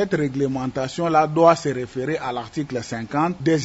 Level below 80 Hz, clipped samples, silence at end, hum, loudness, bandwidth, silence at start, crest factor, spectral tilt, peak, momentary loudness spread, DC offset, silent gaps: -54 dBFS; under 0.1%; 0 s; none; -22 LUFS; 8 kHz; 0 s; 20 dB; -6 dB/octave; -2 dBFS; 11 LU; under 0.1%; none